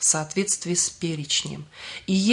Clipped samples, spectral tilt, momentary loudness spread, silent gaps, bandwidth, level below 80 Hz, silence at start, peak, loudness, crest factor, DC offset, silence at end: under 0.1%; -3 dB/octave; 13 LU; none; 11 kHz; -60 dBFS; 0 s; -6 dBFS; -24 LUFS; 20 dB; under 0.1%; 0 s